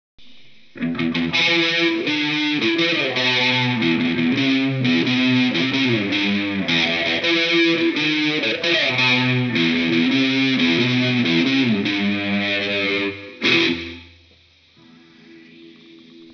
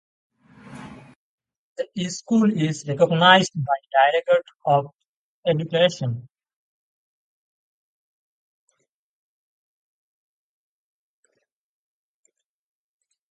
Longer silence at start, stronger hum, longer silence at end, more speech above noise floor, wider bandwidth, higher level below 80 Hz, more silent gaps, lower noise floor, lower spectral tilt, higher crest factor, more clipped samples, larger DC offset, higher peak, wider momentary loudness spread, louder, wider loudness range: second, 0.2 s vs 0.7 s; neither; second, 0 s vs 7.1 s; second, 34 dB vs 52 dB; second, 5.4 kHz vs 9.4 kHz; first, -60 dBFS vs -68 dBFS; second, none vs 1.16-1.38 s, 1.56-1.76 s, 4.55-4.60 s, 4.93-4.99 s, 5.05-5.43 s; second, -53 dBFS vs -72 dBFS; about the same, -5 dB/octave vs -5 dB/octave; second, 18 dB vs 24 dB; neither; neither; about the same, -2 dBFS vs 0 dBFS; second, 5 LU vs 20 LU; about the same, -18 LUFS vs -20 LUFS; second, 4 LU vs 8 LU